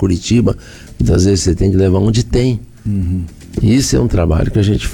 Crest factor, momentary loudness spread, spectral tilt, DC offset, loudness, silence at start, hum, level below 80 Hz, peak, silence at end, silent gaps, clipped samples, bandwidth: 10 dB; 9 LU; -6.5 dB/octave; under 0.1%; -14 LUFS; 0 s; none; -24 dBFS; -4 dBFS; 0 s; none; under 0.1%; 17.5 kHz